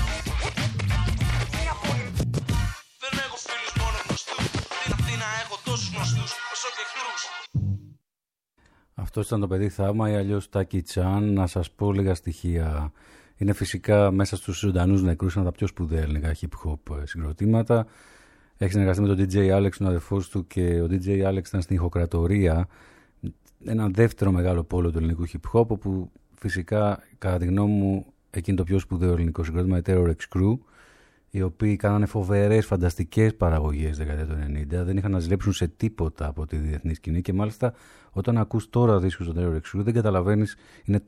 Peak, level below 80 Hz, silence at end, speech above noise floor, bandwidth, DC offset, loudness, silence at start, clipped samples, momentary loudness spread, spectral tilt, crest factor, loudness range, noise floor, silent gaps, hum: -6 dBFS; -36 dBFS; 0.05 s; 66 dB; 13.5 kHz; under 0.1%; -25 LUFS; 0 s; under 0.1%; 9 LU; -6.5 dB/octave; 18 dB; 4 LU; -90 dBFS; none; none